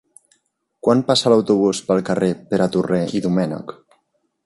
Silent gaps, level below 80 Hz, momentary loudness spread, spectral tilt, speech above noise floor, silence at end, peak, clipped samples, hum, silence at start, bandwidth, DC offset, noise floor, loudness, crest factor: none; -56 dBFS; 8 LU; -5.5 dB/octave; 50 dB; 0.75 s; -2 dBFS; under 0.1%; none; 0.85 s; 11.5 kHz; under 0.1%; -68 dBFS; -18 LUFS; 16 dB